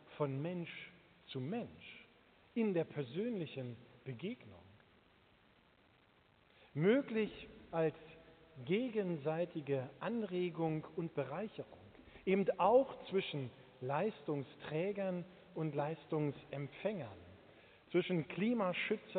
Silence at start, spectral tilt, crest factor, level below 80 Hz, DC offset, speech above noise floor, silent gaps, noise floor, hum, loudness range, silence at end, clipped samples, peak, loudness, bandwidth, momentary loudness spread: 0.05 s; -5.5 dB/octave; 20 dB; -76 dBFS; under 0.1%; 31 dB; none; -70 dBFS; none; 6 LU; 0 s; under 0.1%; -20 dBFS; -39 LUFS; 4.5 kHz; 18 LU